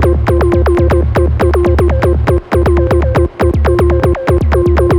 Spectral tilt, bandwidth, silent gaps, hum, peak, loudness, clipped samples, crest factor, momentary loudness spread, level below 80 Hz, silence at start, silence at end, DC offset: -8.5 dB/octave; 12 kHz; none; none; -2 dBFS; -11 LUFS; under 0.1%; 8 dB; 2 LU; -14 dBFS; 0 s; 0 s; under 0.1%